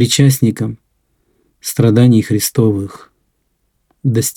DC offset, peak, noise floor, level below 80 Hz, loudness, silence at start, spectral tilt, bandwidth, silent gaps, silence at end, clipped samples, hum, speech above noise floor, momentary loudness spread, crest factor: under 0.1%; 0 dBFS; -65 dBFS; -50 dBFS; -13 LUFS; 0 s; -5.5 dB/octave; 18.5 kHz; none; 0.05 s; under 0.1%; none; 52 dB; 14 LU; 14 dB